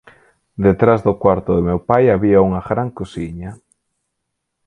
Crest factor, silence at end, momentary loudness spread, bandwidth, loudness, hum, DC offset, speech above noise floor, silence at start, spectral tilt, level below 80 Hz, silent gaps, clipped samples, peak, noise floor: 16 dB; 1.1 s; 15 LU; 9.4 kHz; -16 LUFS; none; under 0.1%; 60 dB; 0.6 s; -9.5 dB/octave; -38 dBFS; none; under 0.1%; 0 dBFS; -75 dBFS